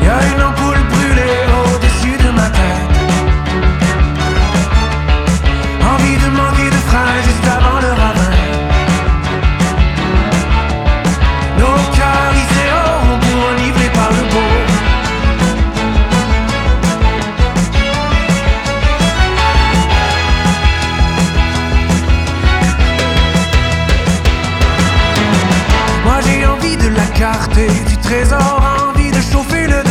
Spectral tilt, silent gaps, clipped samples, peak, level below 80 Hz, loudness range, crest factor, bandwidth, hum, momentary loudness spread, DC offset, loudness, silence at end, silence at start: -5 dB/octave; none; under 0.1%; 0 dBFS; -14 dBFS; 1 LU; 10 dB; 13.5 kHz; none; 3 LU; under 0.1%; -12 LUFS; 0 s; 0 s